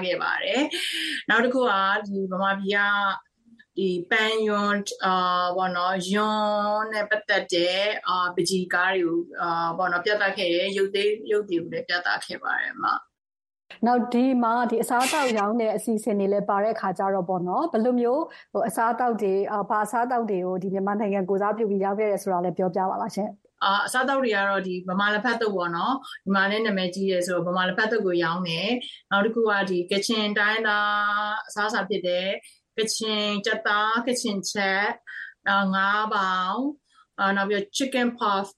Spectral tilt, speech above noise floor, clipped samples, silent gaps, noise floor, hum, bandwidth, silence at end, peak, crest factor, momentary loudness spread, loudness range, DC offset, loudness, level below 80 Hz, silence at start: -4 dB/octave; 33 dB; under 0.1%; none; -57 dBFS; none; 12.5 kHz; 0.05 s; -8 dBFS; 16 dB; 5 LU; 2 LU; under 0.1%; -24 LUFS; -76 dBFS; 0 s